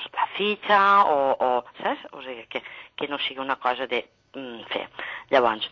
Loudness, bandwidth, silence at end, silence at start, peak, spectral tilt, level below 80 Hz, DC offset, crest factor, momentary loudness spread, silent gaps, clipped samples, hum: -24 LUFS; 7.4 kHz; 0.05 s; 0 s; -6 dBFS; -5 dB/octave; -68 dBFS; under 0.1%; 18 dB; 19 LU; none; under 0.1%; none